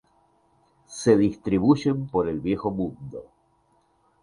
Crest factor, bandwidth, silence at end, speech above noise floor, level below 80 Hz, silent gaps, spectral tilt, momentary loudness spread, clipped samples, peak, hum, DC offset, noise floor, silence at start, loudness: 20 dB; 11 kHz; 1 s; 42 dB; -52 dBFS; none; -7 dB/octave; 19 LU; under 0.1%; -6 dBFS; none; under 0.1%; -65 dBFS; 0.9 s; -24 LUFS